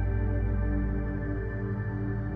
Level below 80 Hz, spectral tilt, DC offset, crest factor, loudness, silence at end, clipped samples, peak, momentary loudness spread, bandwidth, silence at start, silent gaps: -32 dBFS; -11.5 dB/octave; under 0.1%; 12 dB; -31 LUFS; 0 s; under 0.1%; -18 dBFS; 3 LU; 2.5 kHz; 0 s; none